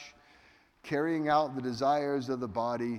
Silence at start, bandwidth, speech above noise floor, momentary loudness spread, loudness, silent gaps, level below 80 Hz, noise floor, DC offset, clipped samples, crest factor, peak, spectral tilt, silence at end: 0 s; 13.5 kHz; 32 dB; 8 LU; -31 LUFS; none; -68 dBFS; -62 dBFS; under 0.1%; under 0.1%; 18 dB; -14 dBFS; -6.5 dB/octave; 0 s